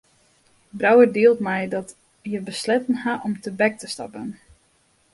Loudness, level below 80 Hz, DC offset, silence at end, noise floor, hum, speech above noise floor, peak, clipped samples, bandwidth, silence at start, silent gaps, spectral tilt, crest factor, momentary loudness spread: -21 LUFS; -64 dBFS; under 0.1%; 0.8 s; -62 dBFS; none; 42 dB; -2 dBFS; under 0.1%; 11.5 kHz; 0.75 s; none; -5 dB/octave; 20 dB; 20 LU